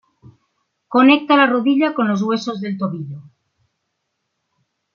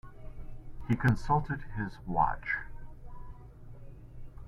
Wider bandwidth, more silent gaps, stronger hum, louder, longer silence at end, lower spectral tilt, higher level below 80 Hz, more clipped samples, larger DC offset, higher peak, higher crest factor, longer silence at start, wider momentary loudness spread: second, 7.2 kHz vs 10 kHz; neither; neither; first, -16 LUFS vs -32 LUFS; first, 1.75 s vs 0 s; second, -6 dB/octave vs -8 dB/octave; second, -68 dBFS vs -44 dBFS; neither; neither; first, -2 dBFS vs -12 dBFS; second, 16 dB vs 22 dB; first, 0.9 s vs 0.05 s; second, 15 LU vs 23 LU